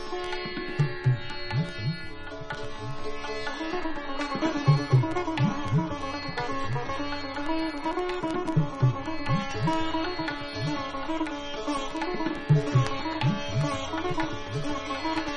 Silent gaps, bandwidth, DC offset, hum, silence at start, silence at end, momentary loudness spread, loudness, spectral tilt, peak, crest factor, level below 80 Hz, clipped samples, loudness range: none; 11 kHz; under 0.1%; none; 0 s; 0 s; 8 LU; -29 LUFS; -6.5 dB/octave; -10 dBFS; 18 dB; -42 dBFS; under 0.1%; 4 LU